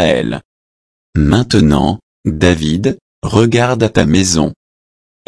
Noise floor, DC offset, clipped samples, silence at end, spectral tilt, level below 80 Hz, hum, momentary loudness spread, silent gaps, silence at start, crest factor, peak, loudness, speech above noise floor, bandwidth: under -90 dBFS; under 0.1%; under 0.1%; 0.75 s; -5.5 dB/octave; -30 dBFS; none; 10 LU; 0.45-1.13 s, 2.03-2.24 s, 3.01-3.22 s; 0 s; 14 dB; 0 dBFS; -13 LUFS; over 78 dB; 11 kHz